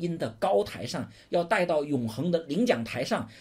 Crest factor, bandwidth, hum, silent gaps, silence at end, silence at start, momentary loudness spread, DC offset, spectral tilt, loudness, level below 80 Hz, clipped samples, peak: 18 dB; 16 kHz; none; none; 0 s; 0 s; 7 LU; under 0.1%; -6 dB/octave; -28 LUFS; -62 dBFS; under 0.1%; -10 dBFS